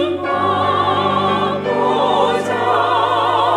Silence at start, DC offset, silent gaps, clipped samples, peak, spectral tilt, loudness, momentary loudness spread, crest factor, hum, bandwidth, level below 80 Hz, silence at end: 0 s; under 0.1%; none; under 0.1%; -2 dBFS; -5.5 dB/octave; -16 LUFS; 3 LU; 14 dB; none; 13 kHz; -60 dBFS; 0 s